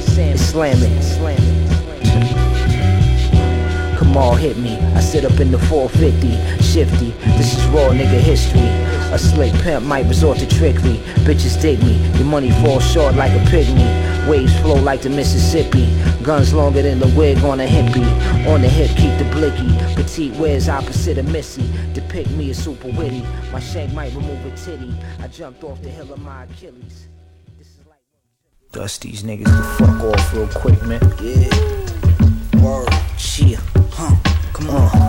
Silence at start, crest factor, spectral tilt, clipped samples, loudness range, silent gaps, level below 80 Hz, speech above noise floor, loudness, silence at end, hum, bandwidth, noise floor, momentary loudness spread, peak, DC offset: 0 s; 14 dB; -6.5 dB/octave; under 0.1%; 12 LU; none; -20 dBFS; 55 dB; -15 LUFS; 0 s; none; 16.5 kHz; -68 dBFS; 12 LU; 0 dBFS; under 0.1%